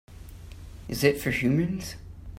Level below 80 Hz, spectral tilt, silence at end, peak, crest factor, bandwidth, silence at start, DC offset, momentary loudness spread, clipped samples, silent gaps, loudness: -46 dBFS; -5.5 dB/octave; 0 s; -8 dBFS; 22 dB; 16 kHz; 0.1 s; under 0.1%; 21 LU; under 0.1%; none; -26 LUFS